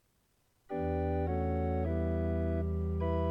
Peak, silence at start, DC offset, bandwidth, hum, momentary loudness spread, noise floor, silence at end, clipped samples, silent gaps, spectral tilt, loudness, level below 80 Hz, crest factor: -20 dBFS; 0.7 s; under 0.1%; 3.9 kHz; none; 2 LU; -73 dBFS; 0 s; under 0.1%; none; -10.5 dB/octave; -34 LUFS; -40 dBFS; 12 dB